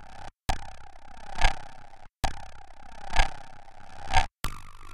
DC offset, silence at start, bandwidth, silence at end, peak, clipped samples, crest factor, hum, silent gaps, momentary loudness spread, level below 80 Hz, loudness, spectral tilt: under 0.1%; 0 s; 13.5 kHz; 0 s; -8 dBFS; under 0.1%; 20 dB; none; none; 22 LU; -32 dBFS; -32 LUFS; -3 dB/octave